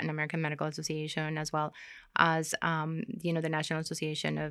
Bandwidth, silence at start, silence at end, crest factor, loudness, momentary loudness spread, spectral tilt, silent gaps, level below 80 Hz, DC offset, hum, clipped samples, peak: 14.5 kHz; 0 s; 0 s; 26 dB; -32 LUFS; 8 LU; -4.5 dB/octave; none; -68 dBFS; under 0.1%; none; under 0.1%; -8 dBFS